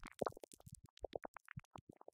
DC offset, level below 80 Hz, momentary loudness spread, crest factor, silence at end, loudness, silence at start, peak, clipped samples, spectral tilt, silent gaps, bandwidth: under 0.1%; -68 dBFS; 14 LU; 28 dB; 0.35 s; -52 LUFS; 0 s; -22 dBFS; under 0.1%; -5 dB/octave; 0.90-0.97 s, 1.28-1.34 s, 1.65-1.71 s; 16.5 kHz